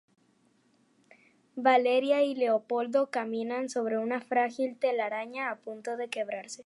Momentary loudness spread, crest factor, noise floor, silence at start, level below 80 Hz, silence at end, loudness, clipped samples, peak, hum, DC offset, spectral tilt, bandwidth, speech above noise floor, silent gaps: 11 LU; 20 dB; -68 dBFS; 1.55 s; -88 dBFS; 0.05 s; -29 LUFS; under 0.1%; -10 dBFS; none; under 0.1%; -4 dB/octave; 11.5 kHz; 39 dB; none